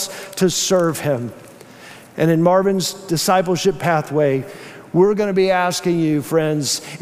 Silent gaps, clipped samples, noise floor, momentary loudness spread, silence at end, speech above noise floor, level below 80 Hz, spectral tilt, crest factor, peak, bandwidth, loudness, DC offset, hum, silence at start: none; under 0.1%; -40 dBFS; 8 LU; 0 s; 23 dB; -54 dBFS; -4.5 dB/octave; 14 dB; -4 dBFS; 16 kHz; -18 LUFS; under 0.1%; none; 0 s